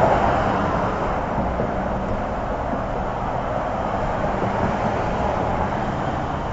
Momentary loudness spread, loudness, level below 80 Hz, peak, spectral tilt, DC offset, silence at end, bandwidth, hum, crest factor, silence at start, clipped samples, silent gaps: 5 LU; -23 LUFS; -32 dBFS; -2 dBFS; -7.5 dB/octave; under 0.1%; 0 s; 8 kHz; none; 20 dB; 0 s; under 0.1%; none